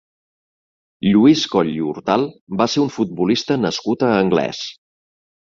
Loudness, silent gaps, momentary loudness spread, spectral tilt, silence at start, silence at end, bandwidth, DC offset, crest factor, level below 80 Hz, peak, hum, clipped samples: -18 LUFS; 2.41-2.47 s; 10 LU; -5.5 dB/octave; 1 s; 0.85 s; 7.6 kHz; under 0.1%; 18 dB; -56 dBFS; -2 dBFS; none; under 0.1%